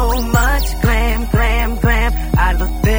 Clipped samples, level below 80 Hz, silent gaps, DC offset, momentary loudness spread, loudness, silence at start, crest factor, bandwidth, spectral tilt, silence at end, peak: under 0.1%; -16 dBFS; none; under 0.1%; 2 LU; -16 LUFS; 0 s; 12 dB; over 20 kHz; -5.5 dB/octave; 0 s; 0 dBFS